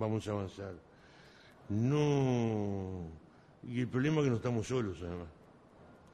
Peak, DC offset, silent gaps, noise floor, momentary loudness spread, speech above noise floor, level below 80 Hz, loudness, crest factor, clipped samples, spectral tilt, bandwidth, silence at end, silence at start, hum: -18 dBFS; under 0.1%; none; -59 dBFS; 17 LU; 25 dB; -62 dBFS; -35 LUFS; 18 dB; under 0.1%; -7.5 dB/octave; 10.5 kHz; 0.2 s; 0 s; none